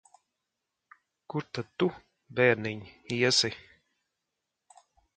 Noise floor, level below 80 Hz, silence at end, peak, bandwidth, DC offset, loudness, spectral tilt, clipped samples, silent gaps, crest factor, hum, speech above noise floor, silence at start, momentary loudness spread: -85 dBFS; -68 dBFS; 1.55 s; -8 dBFS; 9.4 kHz; under 0.1%; -28 LUFS; -3.5 dB/octave; under 0.1%; none; 24 dB; none; 56 dB; 1.3 s; 14 LU